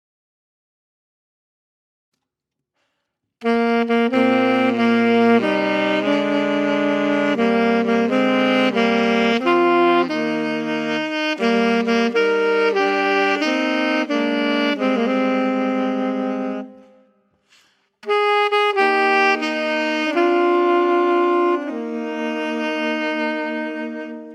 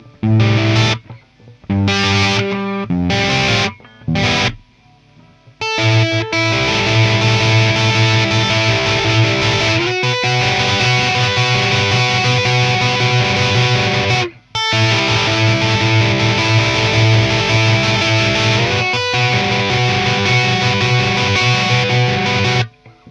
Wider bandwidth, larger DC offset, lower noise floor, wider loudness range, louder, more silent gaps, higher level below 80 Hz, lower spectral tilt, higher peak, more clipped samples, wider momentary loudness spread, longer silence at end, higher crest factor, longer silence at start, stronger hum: first, 10.5 kHz vs 8.8 kHz; neither; first, -82 dBFS vs -49 dBFS; about the same, 5 LU vs 4 LU; second, -18 LUFS vs -14 LUFS; neither; second, -68 dBFS vs -40 dBFS; about the same, -5.5 dB/octave vs -4.5 dB/octave; about the same, -4 dBFS vs -2 dBFS; neither; first, 8 LU vs 4 LU; about the same, 0 s vs 0 s; about the same, 16 dB vs 14 dB; first, 3.4 s vs 0.05 s; neither